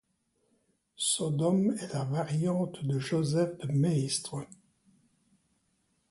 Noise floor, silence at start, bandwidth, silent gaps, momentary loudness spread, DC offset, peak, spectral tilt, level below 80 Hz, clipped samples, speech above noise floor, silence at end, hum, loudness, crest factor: -75 dBFS; 1 s; 11.5 kHz; none; 6 LU; under 0.1%; -16 dBFS; -5.5 dB/octave; -68 dBFS; under 0.1%; 45 dB; 1.55 s; none; -30 LUFS; 16 dB